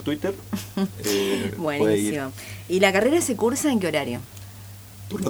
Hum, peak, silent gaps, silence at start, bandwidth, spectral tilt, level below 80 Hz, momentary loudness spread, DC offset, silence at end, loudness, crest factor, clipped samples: none; -2 dBFS; none; 0 s; over 20 kHz; -4.5 dB/octave; -54 dBFS; 20 LU; under 0.1%; 0 s; -23 LUFS; 22 dB; under 0.1%